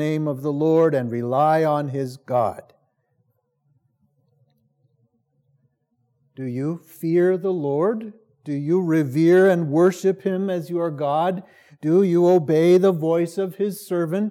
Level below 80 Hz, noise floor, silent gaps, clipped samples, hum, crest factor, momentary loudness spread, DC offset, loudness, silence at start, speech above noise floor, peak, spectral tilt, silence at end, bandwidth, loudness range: -80 dBFS; -70 dBFS; none; under 0.1%; none; 16 dB; 13 LU; under 0.1%; -20 LUFS; 0 s; 50 dB; -6 dBFS; -8 dB/octave; 0 s; 15.5 kHz; 11 LU